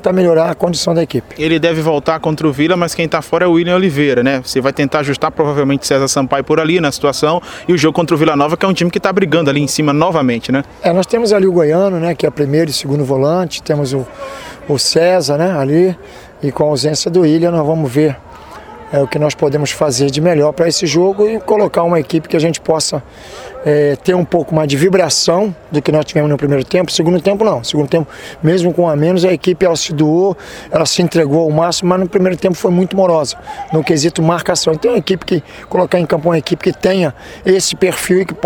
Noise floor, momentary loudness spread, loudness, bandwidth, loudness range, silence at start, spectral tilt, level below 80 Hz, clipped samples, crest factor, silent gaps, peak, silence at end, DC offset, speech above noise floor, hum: -33 dBFS; 6 LU; -13 LUFS; 19.5 kHz; 2 LU; 0 s; -5 dB/octave; -46 dBFS; under 0.1%; 12 dB; none; 0 dBFS; 0 s; under 0.1%; 20 dB; none